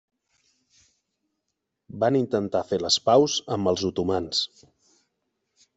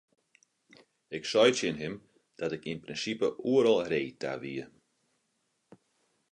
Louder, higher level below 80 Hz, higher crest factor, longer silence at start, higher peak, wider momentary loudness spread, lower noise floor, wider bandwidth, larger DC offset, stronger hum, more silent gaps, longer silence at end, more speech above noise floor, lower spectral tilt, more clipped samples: first, -24 LUFS vs -30 LUFS; about the same, -66 dBFS vs -70 dBFS; about the same, 20 dB vs 22 dB; first, 1.95 s vs 1.1 s; first, -6 dBFS vs -10 dBFS; second, 7 LU vs 16 LU; first, -81 dBFS vs -77 dBFS; second, 8.2 kHz vs 10 kHz; neither; neither; neither; second, 1.3 s vs 1.65 s; first, 57 dB vs 48 dB; about the same, -4.5 dB/octave vs -4 dB/octave; neither